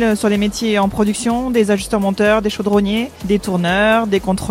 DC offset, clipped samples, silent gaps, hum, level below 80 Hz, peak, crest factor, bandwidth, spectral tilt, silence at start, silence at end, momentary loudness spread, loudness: under 0.1%; under 0.1%; none; none; -38 dBFS; 0 dBFS; 16 dB; 16 kHz; -5 dB/octave; 0 s; 0 s; 5 LU; -16 LUFS